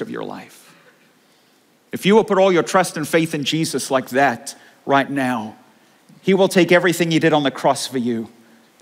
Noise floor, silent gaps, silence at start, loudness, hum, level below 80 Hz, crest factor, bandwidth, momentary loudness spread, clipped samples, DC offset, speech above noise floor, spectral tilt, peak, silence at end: -56 dBFS; none; 0 s; -18 LUFS; none; -66 dBFS; 18 dB; 16 kHz; 16 LU; under 0.1%; under 0.1%; 39 dB; -4.5 dB/octave; -2 dBFS; 0.55 s